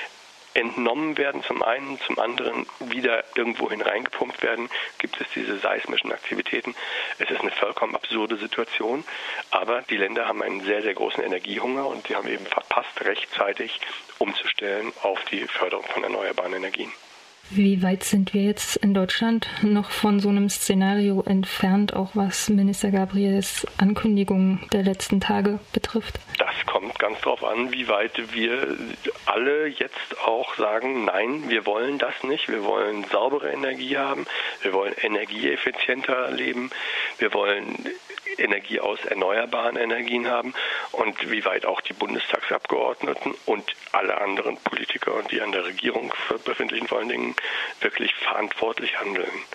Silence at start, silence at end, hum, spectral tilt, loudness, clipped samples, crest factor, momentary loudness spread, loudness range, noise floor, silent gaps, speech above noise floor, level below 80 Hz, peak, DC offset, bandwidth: 0 s; 0 s; none; -4.5 dB/octave; -24 LUFS; under 0.1%; 22 dB; 6 LU; 4 LU; -44 dBFS; none; 20 dB; -58 dBFS; -2 dBFS; under 0.1%; 15.5 kHz